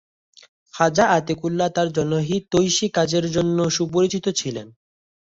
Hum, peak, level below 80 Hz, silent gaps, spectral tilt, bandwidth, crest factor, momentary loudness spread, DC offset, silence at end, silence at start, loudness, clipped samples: none; -2 dBFS; -54 dBFS; none; -4.5 dB/octave; 8 kHz; 18 dB; 7 LU; under 0.1%; 0.7 s; 0.75 s; -20 LUFS; under 0.1%